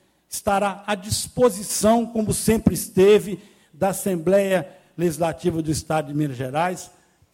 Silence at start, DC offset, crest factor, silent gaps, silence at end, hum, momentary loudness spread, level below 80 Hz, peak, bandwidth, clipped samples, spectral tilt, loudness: 0.3 s; under 0.1%; 18 dB; none; 0.45 s; none; 9 LU; -46 dBFS; -4 dBFS; 16.5 kHz; under 0.1%; -5 dB/octave; -21 LUFS